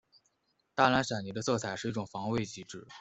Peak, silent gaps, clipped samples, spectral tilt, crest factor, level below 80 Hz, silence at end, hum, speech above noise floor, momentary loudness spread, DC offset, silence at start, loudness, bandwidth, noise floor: -10 dBFS; none; under 0.1%; -4.5 dB/octave; 24 dB; -66 dBFS; 0 s; none; 45 dB; 14 LU; under 0.1%; 0.75 s; -32 LUFS; 8.2 kHz; -77 dBFS